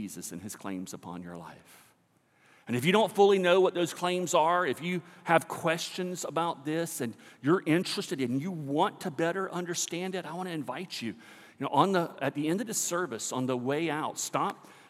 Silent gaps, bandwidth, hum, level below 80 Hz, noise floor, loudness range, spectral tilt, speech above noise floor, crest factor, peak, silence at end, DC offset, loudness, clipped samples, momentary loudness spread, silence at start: none; 16 kHz; none; -84 dBFS; -68 dBFS; 6 LU; -4.5 dB/octave; 38 dB; 22 dB; -8 dBFS; 0.15 s; under 0.1%; -30 LUFS; under 0.1%; 14 LU; 0 s